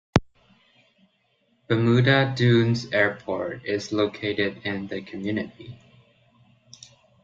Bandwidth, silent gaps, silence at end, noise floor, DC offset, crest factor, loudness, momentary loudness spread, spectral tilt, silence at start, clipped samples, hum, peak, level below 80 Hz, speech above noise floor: 7.6 kHz; none; 1.5 s; -67 dBFS; under 0.1%; 22 dB; -24 LUFS; 12 LU; -6.5 dB/octave; 0.15 s; under 0.1%; none; -2 dBFS; -52 dBFS; 44 dB